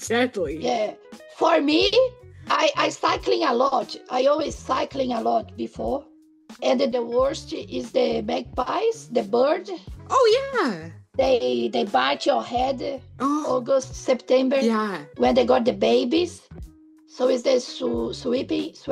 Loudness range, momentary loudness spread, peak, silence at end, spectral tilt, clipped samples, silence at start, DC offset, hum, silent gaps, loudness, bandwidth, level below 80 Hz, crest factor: 4 LU; 9 LU; -6 dBFS; 0 s; -4 dB/octave; under 0.1%; 0 s; under 0.1%; none; none; -23 LUFS; 12 kHz; -50 dBFS; 16 dB